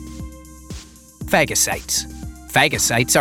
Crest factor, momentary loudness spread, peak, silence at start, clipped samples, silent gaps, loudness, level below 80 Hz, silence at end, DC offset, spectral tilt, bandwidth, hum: 20 dB; 21 LU; -2 dBFS; 0 s; under 0.1%; none; -17 LUFS; -38 dBFS; 0 s; under 0.1%; -2.5 dB/octave; 19 kHz; none